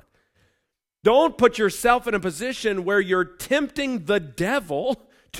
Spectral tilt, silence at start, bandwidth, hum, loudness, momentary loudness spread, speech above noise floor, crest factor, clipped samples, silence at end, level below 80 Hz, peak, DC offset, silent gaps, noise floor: -4.5 dB/octave; 1.05 s; 16 kHz; none; -22 LUFS; 8 LU; 55 dB; 20 dB; under 0.1%; 0 s; -52 dBFS; -4 dBFS; under 0.1%; none; -77 dBFS